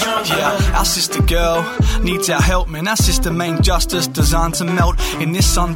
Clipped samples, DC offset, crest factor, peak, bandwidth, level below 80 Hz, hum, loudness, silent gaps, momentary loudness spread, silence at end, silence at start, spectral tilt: under 0.1%; under 0.1%; 12 dB; -2 dBFS; 17 kHz; -20 dBFS; none; -16 LUFS; none; 3 LU; 0 s; 0 s; -4 dB/octave